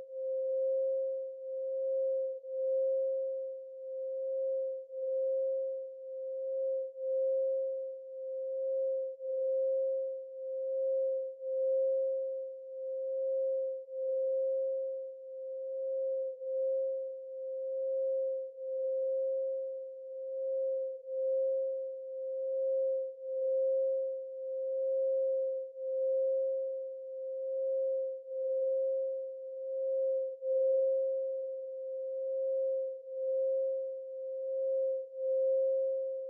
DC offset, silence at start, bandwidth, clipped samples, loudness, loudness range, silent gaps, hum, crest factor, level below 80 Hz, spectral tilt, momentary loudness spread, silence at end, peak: under 0.1%; 0 s; 0.6 kHz; under 0.1%; -35 LUFS; 2 LU; none; none; 10 dB; under -90 dBFS; -2.5 dB/octave; 9 LU; 0 s; -24 dBFS